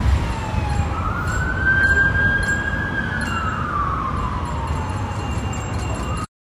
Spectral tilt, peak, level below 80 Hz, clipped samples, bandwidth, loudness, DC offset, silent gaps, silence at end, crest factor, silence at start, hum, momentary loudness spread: -5.5 dB/octave; -6 dBFS; -28 dBFS; under 0.1%; 14.5 kHz; -21 LUFS; under 0.1%; none; 0.2 s; 14 dB; 0 s; none; 10 LU